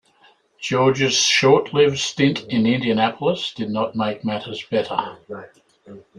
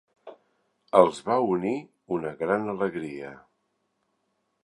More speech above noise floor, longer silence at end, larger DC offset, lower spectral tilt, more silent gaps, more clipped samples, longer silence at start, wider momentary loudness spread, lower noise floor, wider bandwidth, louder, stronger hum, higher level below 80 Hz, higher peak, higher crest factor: second, 36 dB vs 50 dB; second, 0.2 s vs 1.3 s; neither; second, -4 dB/octave vs -6.5 dB/octave; neither; neither; first, 0.6 s vs 0.25 s; about the same, 13 LU vs 15 LU; second, -56 dBFS vs -75 dBFS; about the same, 11.5 kHz vs 11 kHz; first, -19 LUFS vs -26 LUFS; neither; first, -60 dBFS vs -66 dBFS; about the same, -2 dBFS vs -2 dBFS; second, 18 dB vs 26 dB